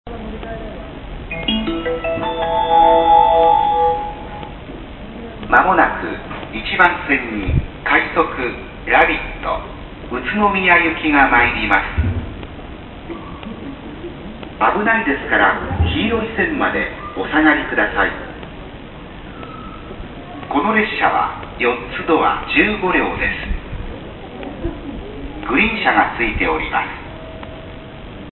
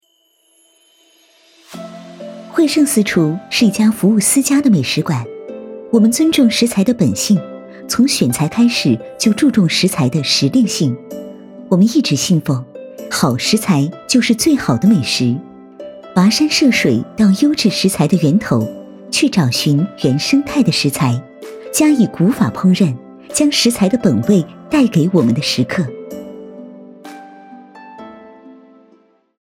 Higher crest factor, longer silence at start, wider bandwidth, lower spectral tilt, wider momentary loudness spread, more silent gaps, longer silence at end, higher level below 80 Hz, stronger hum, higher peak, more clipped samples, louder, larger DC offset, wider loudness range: about the same, 18 dB vs 14 dB; second, 0.05 s vs 1.7 s; second, 4.3 kHz vs 17.5 kHz; first, -8.5 dB/octave vs -5 dB/octave; about the same, 20 LU vs 20 LU; neither; second, 0 s vs 0.9 s; first, -32 dBFS vs -52 dBFS; neither; about the same, 0 dBFS vs -2 dBFS; neither; about the same, -16 LUFS vs -14 LUFS; neither; about the same, 5 LU vs 3 LU